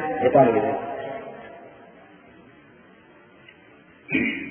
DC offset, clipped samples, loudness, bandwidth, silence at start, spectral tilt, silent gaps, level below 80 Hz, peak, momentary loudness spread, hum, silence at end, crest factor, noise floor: under 0.1%; under 0.1%; -22 LUFS; 3.5 kHz; 0 s; -10.5 dB/octave; none; -62 dBFS; -4 dBFS; 24 LU; none; 0 s; 22 dB; -51 dBFS